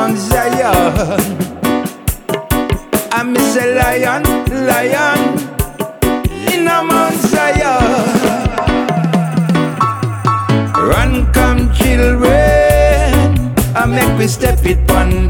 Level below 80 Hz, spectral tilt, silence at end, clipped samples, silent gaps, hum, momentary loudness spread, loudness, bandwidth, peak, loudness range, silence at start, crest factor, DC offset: -20 dBFS; -5.5 dB/octave; 0 s; under 0.1%; none; none; 6 LU; -13 LUFS; 20 kHz; 0 dBFS; 4 LU; 0 s; 12 dB; under 0.1%